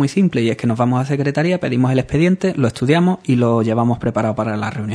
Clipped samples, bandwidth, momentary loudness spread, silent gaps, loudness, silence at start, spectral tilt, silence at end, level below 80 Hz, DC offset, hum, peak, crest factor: under 0.1%; 11 kHz; 4 LU; none; -17 LUFS; 0 s; -7.5 dB/octave; 0 s; -46 dBFS; under 0.1%; none; -2 dBFS; 14 dB